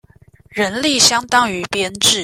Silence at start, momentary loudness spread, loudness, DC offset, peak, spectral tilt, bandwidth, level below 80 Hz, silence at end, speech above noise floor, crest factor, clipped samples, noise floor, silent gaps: 0.55 s; 10 LU; -14 LUFS; under 0.1%; 0 dBFS; -1 dB/octave; 16.5 kHz; -52 dBFS; 0 s; 32 dB; 18 dB; under 0.1%; -48 dBFS; none